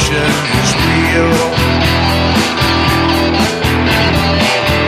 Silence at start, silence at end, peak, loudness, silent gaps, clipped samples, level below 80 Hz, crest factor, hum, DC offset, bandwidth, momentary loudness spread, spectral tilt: 0 s; 0 s; 0 dBFS; -11 LUFS; none; under 0.1%; -24 dBFS; 12 dB; none; under 0.1%; 16 kHz; 2 LU; -4.5 dB/octave